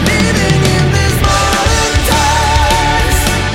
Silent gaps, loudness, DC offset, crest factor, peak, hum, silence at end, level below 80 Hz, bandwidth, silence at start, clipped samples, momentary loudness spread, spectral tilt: none; -11 LUFS; under 0.1%; 10 dB; 0 dBFS; none; 0 s; -18 dBFS; 16.5 kHz; 0 s; under 0.1%; 1 LU; -4 dB/octave